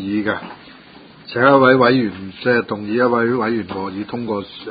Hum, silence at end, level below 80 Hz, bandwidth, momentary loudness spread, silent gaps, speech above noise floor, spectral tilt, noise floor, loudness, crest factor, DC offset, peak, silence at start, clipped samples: none; 0 s; -54 dBFS; 5 kHz; 14 LU; none; 26 dB; -10 dB/octave; -43 dBFS; -17 LUFS; 18 dB; under 0.1%; 0 dBFS; 0 s; under 0.1%